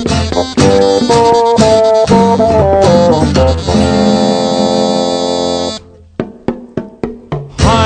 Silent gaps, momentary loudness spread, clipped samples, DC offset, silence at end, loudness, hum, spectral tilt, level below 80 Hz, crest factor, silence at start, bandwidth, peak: none; 15 LU; 0.5%; under 0.1%; 0 s; -10 LUFS; none; -5.5 dB/octave; -30 dBFS; 10 dB; 0 s; 9.4 kHz; 0 dBFS